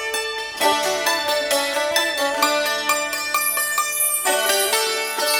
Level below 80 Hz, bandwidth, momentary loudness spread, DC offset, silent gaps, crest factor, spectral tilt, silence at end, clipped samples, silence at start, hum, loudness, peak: -60 dBFS; 19.5 kHz; 3 LU; under 0.1%; none; 16 dB; 1 dB/octave; 0 s; under 0.1%; 0 s; none; -19 LUFS; -4 dBFS